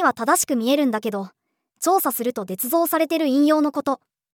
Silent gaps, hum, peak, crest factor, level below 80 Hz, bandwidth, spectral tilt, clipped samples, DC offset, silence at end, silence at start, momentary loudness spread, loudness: none; none; -6 dBFS; 16 dB; -74 dBFS; over 20 kHz; -3.5 dB/octave; under 0.1%; under 0.1%; 0.4 s; 0 s; 9 LU; -21 LUFS